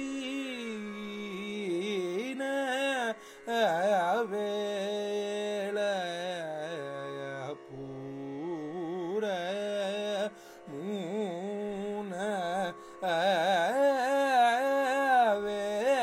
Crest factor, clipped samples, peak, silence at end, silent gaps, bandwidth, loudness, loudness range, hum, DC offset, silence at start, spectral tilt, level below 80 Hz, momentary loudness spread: 16 dB; under 0.1%; -16 dBFS; 0 s; none; 16 kHz; -31 LUFS; 9 LU; none; under 0.1%; 0 s; -4.5 dB/octave; -74 dBFS; 13 LU